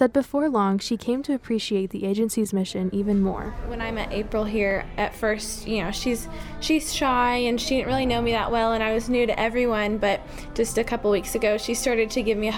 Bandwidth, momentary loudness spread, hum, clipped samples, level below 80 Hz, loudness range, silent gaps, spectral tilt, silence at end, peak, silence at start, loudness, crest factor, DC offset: 18 kHz; 6 LU; none; under 0.1%; -40 dBFS; 3 LU; none; -4.5 dB/octave; 0 s; -6 dBFS; 0 s; -24 LUFS; 18 dB; under 0.1%